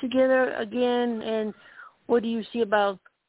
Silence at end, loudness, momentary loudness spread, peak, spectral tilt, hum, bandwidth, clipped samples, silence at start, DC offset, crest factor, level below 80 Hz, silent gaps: 0.3 s; -25 LUFS; 10 LU; -10 dBFS; -9 dB/octave; none; 4 kHz; under 0.1%; 0 s; under 0.1%; 16 dB; -66 dBFS; none